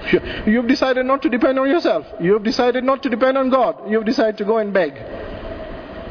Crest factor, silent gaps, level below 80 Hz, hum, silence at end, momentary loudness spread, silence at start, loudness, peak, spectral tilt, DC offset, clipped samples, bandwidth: 14 dB; none; -42 dBFS; none; 0 s; 15 LU; 0 s; -18 LUFS; -4 dBFS; -6 dB/octave; under 0.1%; under 0.1%; 5.4 kHz